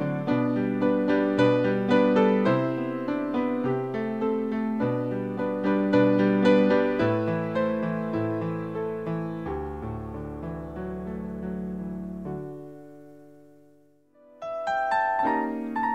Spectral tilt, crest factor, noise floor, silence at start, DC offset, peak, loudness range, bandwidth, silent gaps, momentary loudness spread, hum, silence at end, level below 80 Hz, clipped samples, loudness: -8.5 dB/octave; 18 dB; -60 dBFS; 0 s; 0.2%; -8 dBFS; 12 LU; 8.8 kHz; none; 14 LU; none; 0 s; -54 dBFS; under 0.1%; -26 LUFS